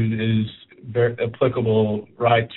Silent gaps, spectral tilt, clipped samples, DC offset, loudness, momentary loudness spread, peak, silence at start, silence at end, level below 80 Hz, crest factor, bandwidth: none; -6 dB/octave; under 0.1%; under 0.1%; -21 LUFS; 8 LU; -4 dBFS; 0 s; 0 s; -54 dBFS; 16 dB; 4.1 kHz